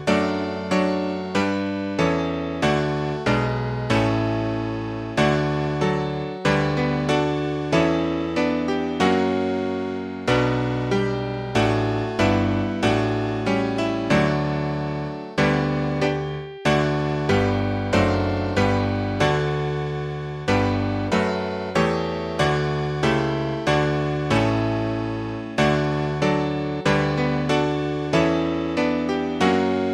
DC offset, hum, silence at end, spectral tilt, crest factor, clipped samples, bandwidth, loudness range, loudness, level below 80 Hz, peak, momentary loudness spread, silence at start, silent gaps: under 0.1%; none; 0 s; -6.5 dB/octave; 16 dB; under 0.1%; 11.5 kHz; 1 LU; -22 LUFS; -42 dBFS; -6 dBFS; 6 LU; 0 s; none